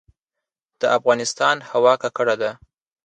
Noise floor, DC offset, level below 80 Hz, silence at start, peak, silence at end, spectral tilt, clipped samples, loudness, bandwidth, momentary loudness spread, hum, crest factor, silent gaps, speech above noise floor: -85 dBFS; under 0.1%; -66 dBFS; 0.8 s; -4 dBFS; 0.5 s; -3 dB/octave; under 0.1%; -20 LUFS; 9.6 kHz; 7 LU; none; 18 dB; none; 66 dB